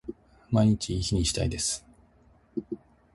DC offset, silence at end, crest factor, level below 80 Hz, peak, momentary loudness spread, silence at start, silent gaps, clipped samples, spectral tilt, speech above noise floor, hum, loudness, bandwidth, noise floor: under 0.1%; 0.4 s; 20 dB; -42 dBFS; -10 dBFS; 17 LU; 0.05 s; none; under 0.1%; -5 dB/octave; 34 dB; none; -28 LUFS; 11.5 kHz; -60 dBFS